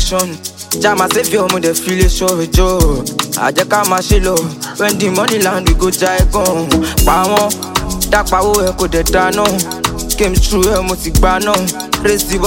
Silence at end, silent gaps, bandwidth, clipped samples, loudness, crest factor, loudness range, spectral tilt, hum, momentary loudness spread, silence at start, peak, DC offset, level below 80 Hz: 0 s; none; 17 kHz; under 0.1%; -13 LUFS; 12 dB; 1 LU; -4 dB/octave; none; 5 LU; 0 s; 0 dBFS; under 0.1%; -20 dBFS